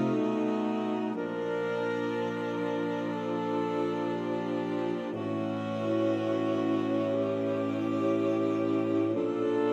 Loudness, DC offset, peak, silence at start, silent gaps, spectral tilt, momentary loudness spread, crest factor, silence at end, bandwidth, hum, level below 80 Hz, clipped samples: -30 LUFS; under 0.1%; -18 dBFS; 0 s; none; -7.5 dB/octave; 4 LU; 12 dB; 0 s; 8.2 kHz; none; -78 dBFS; under 0.1%